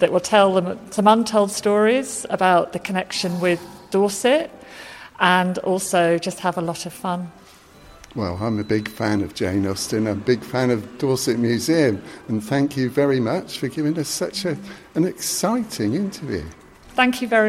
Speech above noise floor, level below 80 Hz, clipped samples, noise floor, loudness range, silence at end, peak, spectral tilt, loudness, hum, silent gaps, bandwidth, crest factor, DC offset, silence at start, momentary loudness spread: 26 dB; -54 dBFS; under 0.1%; -47 dBFS; 5 LU; 0 s; -2 dBFS; -4.5 dB/octave; -21 LUFS; none; none; 16 kHz; 20 dB; under 0.1%; 0 s; 11 LU